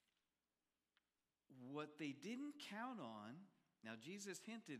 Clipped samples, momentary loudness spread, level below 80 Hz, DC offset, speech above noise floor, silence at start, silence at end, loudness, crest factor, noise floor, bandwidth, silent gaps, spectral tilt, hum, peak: under 0.1%; 9 LU; under -90 dBFS; under 0.1%; over 37 dB; 1.5 s; 0 s; -54 LUFS; 20 dB; under -90 dBFS; 14.5 kHz; none; -4 dB/octave; none; -36 dBFS